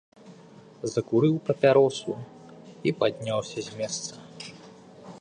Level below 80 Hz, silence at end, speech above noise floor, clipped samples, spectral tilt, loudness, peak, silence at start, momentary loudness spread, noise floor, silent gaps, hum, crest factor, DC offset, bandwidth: -68 dBFS; 0.05 s; 25 dB; under 0.1%; -5.5 dB/octave; -26 LUFS; -6 dBFS; 0.25 s; 21 LU; -50 dBFS; none; none; 20 dB; under 0.1%; 10 kHz